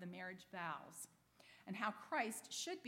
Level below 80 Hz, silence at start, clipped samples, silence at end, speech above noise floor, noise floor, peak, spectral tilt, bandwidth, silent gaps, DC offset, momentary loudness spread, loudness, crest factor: -90 dBFS; 0 s; under 0.1%; 0 s; 21 dB; -68 dBFS; -26 dBFS; -3 dB/octave; 16.5 kHz; none; under 0.1%; 14 LU; -46 LUFS; 22 dB